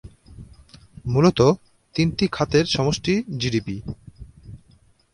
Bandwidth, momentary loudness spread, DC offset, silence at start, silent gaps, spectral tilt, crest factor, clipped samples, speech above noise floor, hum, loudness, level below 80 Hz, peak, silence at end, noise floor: 11.5 kHz; 17 LU; under 0.1%; 0.05 s; none; -6 dB/octave; 20 dB; under 0.1%; 36 dB; none; -21 LUFS; -44 dBFS; -4 dBFS; 0.55 s; -56 dBFS